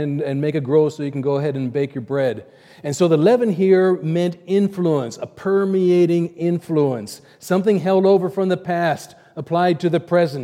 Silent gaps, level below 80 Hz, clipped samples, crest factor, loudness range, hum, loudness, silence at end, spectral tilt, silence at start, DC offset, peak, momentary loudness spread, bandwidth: none; -68 dBFS; under 0.1%; 16 dB; 2 LU; none; -19 LUFS; 0 s; -7 dB/octave; 0 s; under 0.1%; -4 dBFS; 12 LU; 15 kHz